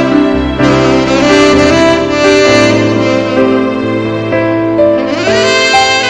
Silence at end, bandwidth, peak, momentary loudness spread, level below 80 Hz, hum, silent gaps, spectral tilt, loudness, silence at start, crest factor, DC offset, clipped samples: 0 s; 10.5 kHz; 0 dBFS; 6 LU; -30 dBFS; none; none; -4.5 dB/octave; -9 LUFS; 0 s; 8 dB; under 0.1%; 0.5%